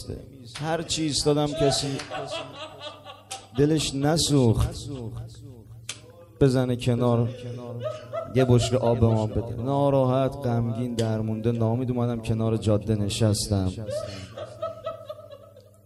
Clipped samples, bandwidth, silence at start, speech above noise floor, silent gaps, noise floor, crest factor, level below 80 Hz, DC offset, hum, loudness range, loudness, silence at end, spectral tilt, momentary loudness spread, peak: under 0.1%; 12.5 kHz; 0 s; 25 dB; none; -50 dBFS; 20 dB; -44 dBFS; under 0.1%; none; 3 LU; -25 LUFS; 0.25 s; -6 dB/octave; 18 LU; -6 dBFS